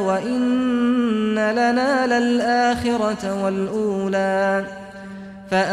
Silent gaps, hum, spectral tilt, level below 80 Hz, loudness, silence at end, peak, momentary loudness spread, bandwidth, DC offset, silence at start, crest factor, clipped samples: none; none; -5.5 dB/octave; -52 dBFS; -20 LUFS; 0 s; -8 dBFS; 12 LU; 11 kHz; under 0.1%; 0 s; 12 dB; under 0.1%